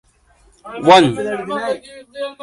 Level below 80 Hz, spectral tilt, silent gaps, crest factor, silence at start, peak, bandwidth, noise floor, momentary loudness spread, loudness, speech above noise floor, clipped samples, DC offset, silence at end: -54 dBFS; -5 dB/octave; none; 18 dB; 0.65 s; 0 dBFS; 11.5 kHz; -53 dBFS; 20 LU; -15 LUFS; 37 dB; under 0.1%; under 0.1%; 0.1 s